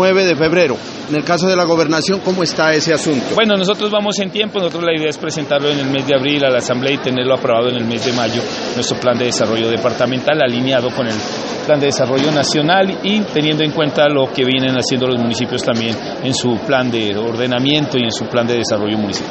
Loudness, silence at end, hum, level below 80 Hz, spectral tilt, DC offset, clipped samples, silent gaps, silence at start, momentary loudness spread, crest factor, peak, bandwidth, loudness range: -15 LUFS; 0 s; none; -52 dBFS; -4.5 dB/octave; under 0.1%; under 0.1%; none; 0 s; 5 LU; 16 dB; 0 dBFS; 8.8 kHz; 2 LU